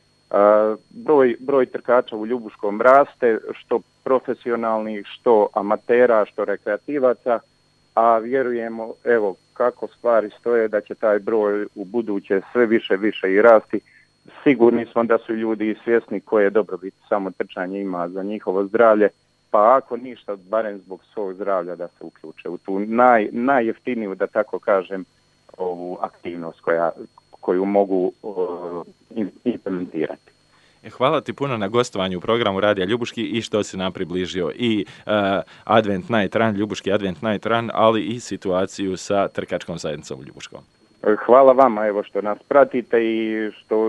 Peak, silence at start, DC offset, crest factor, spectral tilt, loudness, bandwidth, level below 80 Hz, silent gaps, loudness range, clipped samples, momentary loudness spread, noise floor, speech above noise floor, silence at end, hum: 0 dBFS; 0.3 s; under 0.1%; 20 dB; -6 dB/octave; -20 LUFS; 10.5 kHz; -64 dBFS; none; 6 LU; under 0.1%; 14 LU; -56 dBFS; 36 dB; 0 s; none